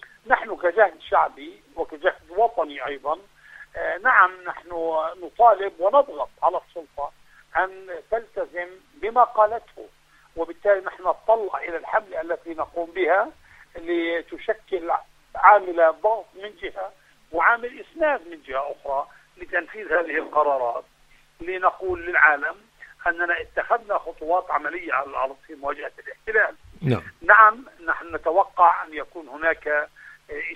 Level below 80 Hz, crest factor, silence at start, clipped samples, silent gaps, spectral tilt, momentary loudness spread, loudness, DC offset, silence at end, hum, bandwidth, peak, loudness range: -56 dBFS; 24 dB; 0.25 s; under 0.1%; none; -6.5 dB/octave; 16 LU; -22 LUFS; under 0.1%; 0 s; none; 9.4 kHz; 0 dBFS; 6 LU